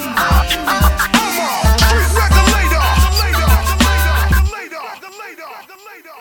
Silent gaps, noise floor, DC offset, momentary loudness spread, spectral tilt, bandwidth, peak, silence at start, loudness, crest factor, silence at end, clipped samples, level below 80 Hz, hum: none; -38 dBFS; under 0.1%; 19 LU; -4 dB/octave; 19.5 kHz; 0 dBFS; 0 s; -13 LUFS; 14 dB; 0 s; under 0.1%; -16 dBFS; none